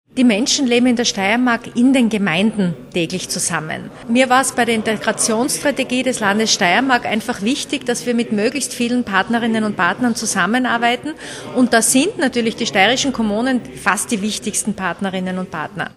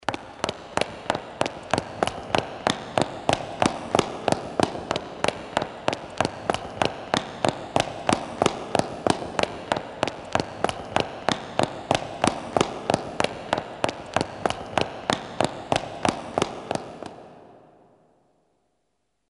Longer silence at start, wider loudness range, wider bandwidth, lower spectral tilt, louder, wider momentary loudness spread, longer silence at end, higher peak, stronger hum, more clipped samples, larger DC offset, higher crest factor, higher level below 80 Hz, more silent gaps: about the same, 0.15 s vs 0.1 s; about the same, 2 LU vs 3 LU; first, 14 kHz vs 11.5 kHz; about the same, -3 dB/octave vs -4 dB/octave; first, -17 LUFS vs -27 LUFS; first, 8 LU vs 5 LU; second, 0.05 s vs 1.65 s; first, 0 dBFS vs -4 dBFS; neither; neither; neither; second, 18 dB vs 24 dB; about the same, -52 dBFS vs -52 dBFS; neither